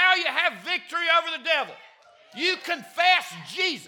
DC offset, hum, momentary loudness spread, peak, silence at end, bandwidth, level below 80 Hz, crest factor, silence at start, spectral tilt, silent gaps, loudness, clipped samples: under 0.1%; none; 10 LU; -6 dBFS; 0 s; 19 kHz; under -90 dBFS; 20 dB; 0 s; -1.5 dB/octave; none; -23 LUFS; under 0.1%